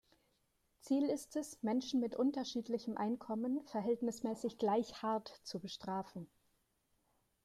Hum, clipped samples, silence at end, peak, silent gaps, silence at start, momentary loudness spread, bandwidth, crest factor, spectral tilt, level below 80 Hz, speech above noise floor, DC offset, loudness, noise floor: none; under 0.1%; 1.2 s; -24 dBFS; none; 0.85 s; 9 LU; 14 kHz; 16 dB; -5.5 dB/octave; -78 dBFS; 41 dB; under 0.1%; -39 LUFS; -80 dBFS